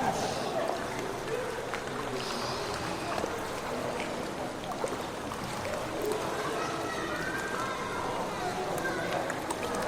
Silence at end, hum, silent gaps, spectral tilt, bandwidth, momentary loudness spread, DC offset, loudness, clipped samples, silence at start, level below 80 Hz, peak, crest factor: 0 s; none; none; -4 dB/octave; 19.5 kHz; 3 LU; under 0.1%; -33 LUFS; under 0.1%; 0 s; -56 dBFS; -16 dBFS; 18 dB